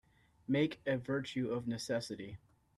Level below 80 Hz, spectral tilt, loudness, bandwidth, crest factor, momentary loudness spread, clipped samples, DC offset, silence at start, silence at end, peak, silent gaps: -70 dBFS; -6 dB/octave; -37 LUFS; 13 kHz; 18 dB; 15 LU; under 0.1%; under 0.1%; 0.5 s; 0.4 s; -20 dBFS; none